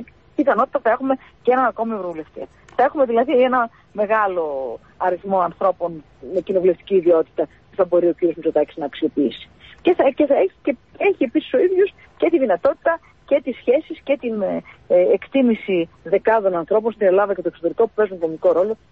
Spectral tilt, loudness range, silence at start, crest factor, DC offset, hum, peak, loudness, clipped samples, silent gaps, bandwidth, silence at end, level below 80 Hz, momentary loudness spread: -8 dB/octave; 2 LU; 0 s; 16 dB; 0.1%; none; -4 dBFS; -19 LUFS; under 0.1%; none; 4.6 kHz; 0.15 s; -56 dBFS; 10 LU